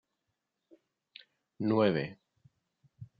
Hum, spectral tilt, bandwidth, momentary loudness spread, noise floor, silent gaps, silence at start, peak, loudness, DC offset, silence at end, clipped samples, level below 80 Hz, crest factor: none; -5.5 dB/octave; 5 kHz; 27 LU; -85 dBFS; none; 1.6 s; -14 dBFS; -31 LUFS; under 0.1%; 0.15 s; under 0.1%; -74 dBFS; 22 dB